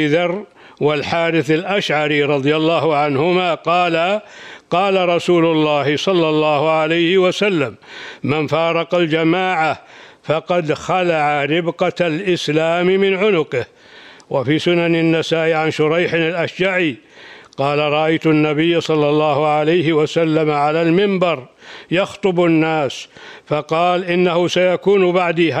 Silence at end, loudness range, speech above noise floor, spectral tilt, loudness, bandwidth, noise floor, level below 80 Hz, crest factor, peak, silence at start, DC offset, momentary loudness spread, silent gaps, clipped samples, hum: 0 s; 2 LU; 26 dB; -6 dB/octave; -16 LUFS; 10.5 kHz; -42 dBFS; -60 dBFS; 12 dB; -4 dBFS; 0 s; under 0.1%; 7 LU; none; under 0.1%; none